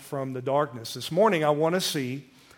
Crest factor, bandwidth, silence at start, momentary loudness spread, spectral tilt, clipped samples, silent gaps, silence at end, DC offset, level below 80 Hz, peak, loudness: 18 dB; 17.5 kHz; 0 s; 12 LU; -4.5 dB/octave; under 0.1%; none; 0.35 s; under 0.1%; -72 dBFS; -10 dBFS; -26 LUFS